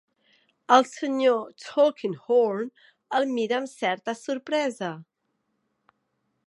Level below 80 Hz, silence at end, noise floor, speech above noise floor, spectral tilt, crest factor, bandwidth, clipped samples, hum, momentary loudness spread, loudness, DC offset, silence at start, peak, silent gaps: -84 dBFS; 1.45 s; -76 dBFS; 52 dB; -4.5 dB/octave; 22 dB; 11.5 kHz; under 0.1%; none; 13 LU; -25 LUFS; under 0.1%; 0.7 s; -4 dBFS; none